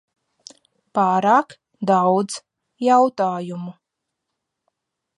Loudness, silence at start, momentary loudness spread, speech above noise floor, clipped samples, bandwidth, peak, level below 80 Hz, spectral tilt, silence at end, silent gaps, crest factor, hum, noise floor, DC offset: -19 LUFS; 0.95 s; 17 LU; 62 dB; under 0.1%; 11 kHz; -4 dBFS; -76 dBFS; -6 dB/octave; 1.45 s; none; 18 dB; none; -80 dBFS; under 0.1%